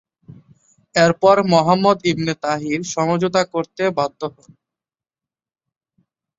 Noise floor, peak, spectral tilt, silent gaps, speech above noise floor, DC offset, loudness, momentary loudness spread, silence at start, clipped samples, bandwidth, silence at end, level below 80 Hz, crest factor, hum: under -90 dBFS; -2 dBFS; -5 dB/octave; none; over 73 dB; under 0.1%; -18 LUFS; 9 LU; 0.95 s; under 0.1%; 7.8 kHz; 2.1 s; -58 dBFS; 18 dB; none